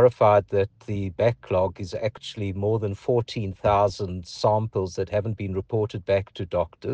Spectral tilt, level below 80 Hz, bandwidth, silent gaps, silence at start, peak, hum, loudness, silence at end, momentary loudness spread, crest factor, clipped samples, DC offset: -7 dB/octave; -50 dBFS; 8.8 kHz; none; 0 s; -4 dBFS; none; -25 LUFS; 0 s; 9 LU; 20 dB; under 0.1%; under 0.1%